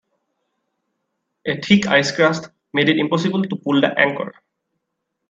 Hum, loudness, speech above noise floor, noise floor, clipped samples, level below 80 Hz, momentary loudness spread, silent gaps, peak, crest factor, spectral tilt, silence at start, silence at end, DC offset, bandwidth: none; -18 LUFS; 59 dB; -77 dBFS; under 0.1%; -62 dBFS; 13 LU; none; 0 dBFS; 20 dB; -5 dB/octave; 1.45 s; 1 s; under 0.1%; 7.8 kHz